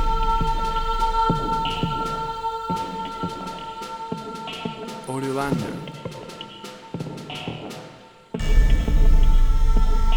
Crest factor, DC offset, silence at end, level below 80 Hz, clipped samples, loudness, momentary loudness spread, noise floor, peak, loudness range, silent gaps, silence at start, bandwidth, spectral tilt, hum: 16 dB; under 0.1%; 0 s; -22 dBFS; under 0.1%; -26 LUFS; 14 LU; -45 dBFS; -6 dBFS; 6 LU; none; 0 s; 11 kHz; -6 dB/octave; none